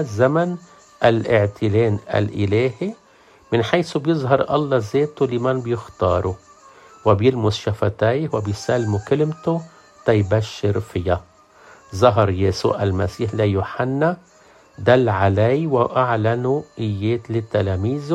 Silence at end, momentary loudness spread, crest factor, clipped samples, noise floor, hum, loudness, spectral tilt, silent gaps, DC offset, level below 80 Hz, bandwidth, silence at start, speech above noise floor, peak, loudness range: 0 s; 7 LU; 18 dB; under 0.1%; -51 dBFS; none; -20 LUFS; -7 dB/octave; none; under 0.1%; -52 dBFS; 9.8 kHz; 0 s; 32 dB; 0 dBFS; 2 LU